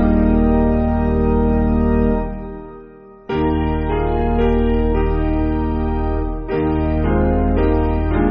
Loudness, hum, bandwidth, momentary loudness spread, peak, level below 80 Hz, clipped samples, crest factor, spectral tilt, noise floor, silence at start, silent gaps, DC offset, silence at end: -18 LUFS; none; 5 kHz; 7 LU; -2 dBFS; -22 dBFS; under 0.1%; 14 dB; -8.5 dB/octave; -40 dBFS; 0 s; none; under 0.1%; 0 s